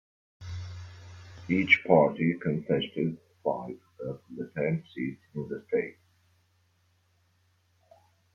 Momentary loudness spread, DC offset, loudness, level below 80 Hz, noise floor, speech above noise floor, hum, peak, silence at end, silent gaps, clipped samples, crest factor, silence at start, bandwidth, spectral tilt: 22 LU; under 0.1%; -29 LUFS; -66 dBFS; -69 dBFS; 41 dB; none; -6 dBFS; 2.45 s; none; under 0.1%; 24 dB; 0.4 s; 7.2 kHz; -7.5 dB/octave